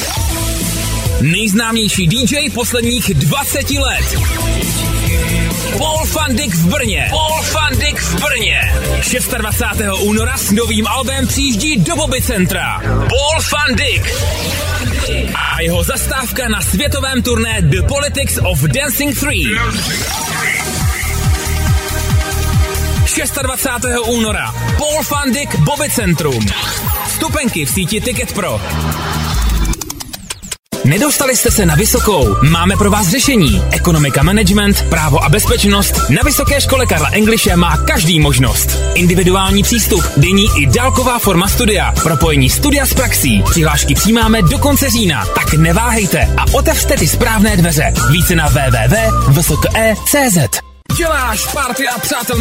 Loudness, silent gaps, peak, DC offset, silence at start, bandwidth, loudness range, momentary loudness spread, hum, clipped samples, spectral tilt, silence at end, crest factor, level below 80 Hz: -12 LUFS; 30.59-30.63 s; 0 dBFS; under 0.1%; 0 s; 16.5 kHz; 4 LU; 6 LU; none; under 0.1%; -4 dB/octave; 0 s; 12 dB; -20 dBFS